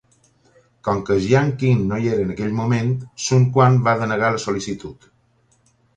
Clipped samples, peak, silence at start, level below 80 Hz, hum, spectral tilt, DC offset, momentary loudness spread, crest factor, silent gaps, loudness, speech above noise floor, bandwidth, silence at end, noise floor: under 0.1%; -2 dBFS; 0.85 s; -48 dBFS; none; -6.5 dB/octave; under 0.1%; 10 LU; 18 dB; none; -19 LUFS; 42 dB; 9.2 kHz; 1.05 s; -60 dBFS